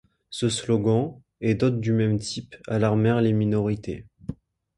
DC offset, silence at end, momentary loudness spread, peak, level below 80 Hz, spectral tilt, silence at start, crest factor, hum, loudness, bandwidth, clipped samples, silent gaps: under 0.1%; 0.45 s; 15 LU; -8 dBFS; -52 dBFS; -6.5 dB/octave; 0.3 s; 16 dB; none; -24 LUFS; 11.5 kHz; under 0.1%; none